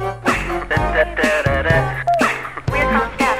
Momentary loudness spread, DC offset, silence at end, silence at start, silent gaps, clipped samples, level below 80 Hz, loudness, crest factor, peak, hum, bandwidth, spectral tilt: 4 LU; under 0.1%; 0 s; 0 s; none; under 0.1%; -30 dBFS; -17 LUFS; 16 dB; -2 dBFS; none; 16 kHz; -5.5 dB/octave